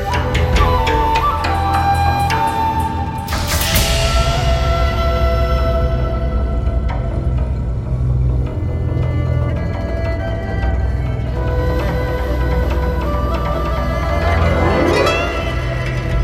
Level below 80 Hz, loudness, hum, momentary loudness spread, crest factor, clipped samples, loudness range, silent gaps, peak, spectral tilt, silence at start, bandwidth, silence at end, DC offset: -20 dBFS; -17 LUFS; none; 6 LU; 14 dB; under 0.1%; 3 LU; none; -2 dBFS; -5.5 dB/octave; 0 s; 16.5 kHz; 0 s; under 0.1%